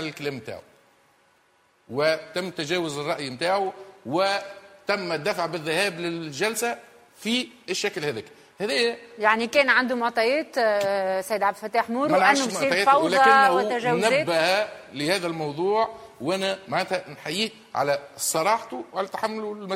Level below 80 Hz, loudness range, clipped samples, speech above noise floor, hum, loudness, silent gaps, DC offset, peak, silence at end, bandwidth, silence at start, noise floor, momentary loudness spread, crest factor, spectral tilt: -70 dBFS; 7 LU; under 0.1%; 39 dB; none; -24 LUFS; none; under 0.1%; -4 dBFS; 0 s; 16 kHz; 0 s; -63 dBFS; 12 LU; 20 dB; -3 dB/octave